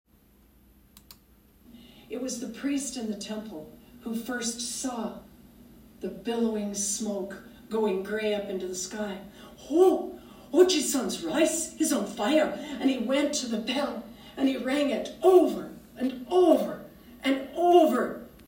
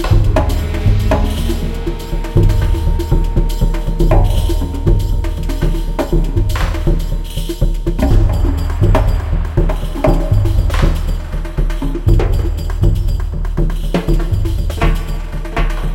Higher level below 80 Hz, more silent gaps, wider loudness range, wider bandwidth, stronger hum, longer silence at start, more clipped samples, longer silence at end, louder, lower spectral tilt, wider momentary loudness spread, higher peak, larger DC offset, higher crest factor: second, -62 dBFS vs -14 dBFS; neither; first, 10 LU vs 2 LU; first, 16 kHz vs 14 kHz; neither; first, 1.7 s vs 0 s; neither; about the same, 0.05 s vs 0 s; second, -27 LUFS vs -17 LUFS; second, -3.5 dB/octave vs -7 dB/octave; first, 18 LU vs 7 LU; second, -8 dBFS vs 0 dBFS; neither; first, 20 dB vs 14 dB